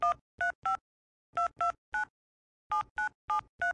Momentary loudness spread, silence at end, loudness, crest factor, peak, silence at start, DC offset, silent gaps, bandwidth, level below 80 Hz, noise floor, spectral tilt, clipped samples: 5 LU; 0 s; -34 LUFS; 16 dB; -20 dBFS; 0 s; under 0.1%; 0.21-0.38 s, 0.55-0.62 s, 0.81-1.33 s, 1.78-1.92 s, 2.10-2.70 s, 2.90-2.96 s, 3.15-3.28 s, 3.49-3.58 s; 10.5 kHz; -66 dBFS; under -90 dBFS; -2.5 dB/octave; under 0.1%